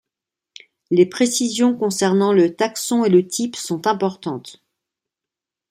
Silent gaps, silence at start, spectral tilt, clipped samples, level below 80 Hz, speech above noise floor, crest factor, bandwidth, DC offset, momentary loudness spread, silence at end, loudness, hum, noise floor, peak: none; 0.9 s; -4.5 dB/octave; under 0.1%; -66 dBFS; 69 dB; 16 dB; 16 kHz; under 0.1%; 8 LU; 1.2 s; -18 LUFS; none; -87 dBFS; -4 dBFS